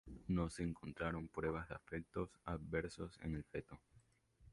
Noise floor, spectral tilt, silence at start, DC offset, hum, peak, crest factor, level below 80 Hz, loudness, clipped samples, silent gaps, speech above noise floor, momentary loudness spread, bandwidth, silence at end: -71 dBFS; -7 dB/octave; 0.05 s; under 0.1%; none; -26 dBFS; 20 dB; -58 dBFS; -45 LUFS; under 0.1%; none; 27 dB; 8 LU; 11.5 kHz; 0 s